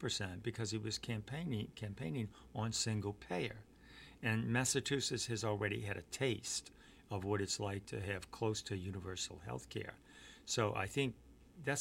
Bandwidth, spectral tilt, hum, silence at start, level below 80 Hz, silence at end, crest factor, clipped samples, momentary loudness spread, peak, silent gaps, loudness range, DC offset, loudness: 16.5 kHz; -4 dB/octave; none; 0 s; -64 dBFS; 0 s; 22 dB; under 0.1%; 11 LU; -20 dBFS; none; 4 LU; under 0.1%; -40 LUFS